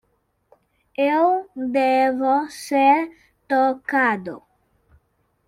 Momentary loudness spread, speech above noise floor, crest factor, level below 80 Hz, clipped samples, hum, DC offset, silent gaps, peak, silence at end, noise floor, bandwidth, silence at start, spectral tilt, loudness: 13 LU; 49 dB; 16 dB; -68 dBFS; under 0.1%; none; under 0.1%; none; -4 dBFS; 1.1 s; -68 dBFS; 15 kHz; 1 s; -4.5 dB/octave; -20 LUFS